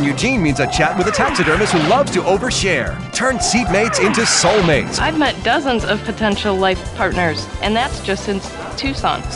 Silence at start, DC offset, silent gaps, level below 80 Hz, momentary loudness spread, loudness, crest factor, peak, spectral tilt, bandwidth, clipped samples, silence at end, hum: 0 s; under 0.1%; none; -32 dBFS; 7 LU; -16 LUFS; 14 dB; -2 dBFS; -4 dB/octave; 11.5 kHz; under 0.1%; 0 s; none